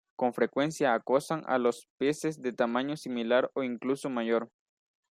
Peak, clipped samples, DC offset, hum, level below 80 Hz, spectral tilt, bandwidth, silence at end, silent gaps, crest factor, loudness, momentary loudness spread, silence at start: -12 dBFS; under 0.1%; under 0.1%; none; -78 dBFS; -5 dB/octave; 15 kHz; 0.65 s; 1.90-1.98 s; 18 dB; -30 LUFS; 5 LU; 0.2 s